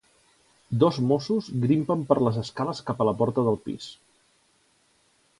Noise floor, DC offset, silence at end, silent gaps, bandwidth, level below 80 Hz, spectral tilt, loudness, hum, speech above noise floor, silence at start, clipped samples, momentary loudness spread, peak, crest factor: -65 dBFS; under 0.1%; 1.45 s; none; 11.5 kHz; -60 dBFS; -8 dB/octave; -25 LUFS; none; 41 dB; 0.7 s; under 0.1%; 9 LU; -4 dBFS; 22 dB